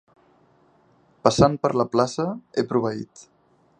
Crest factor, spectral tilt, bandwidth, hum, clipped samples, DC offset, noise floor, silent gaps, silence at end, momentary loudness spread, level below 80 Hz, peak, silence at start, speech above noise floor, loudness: 24 dB; -6 dB/octave; 10 kHz; none; under 0.1%; under 0.1%; -59 dBFS; none; 0.6 s; 11 LU; -50 dBFS; 0 dBFS; 1.25 s; 38 dB; -22 LUFS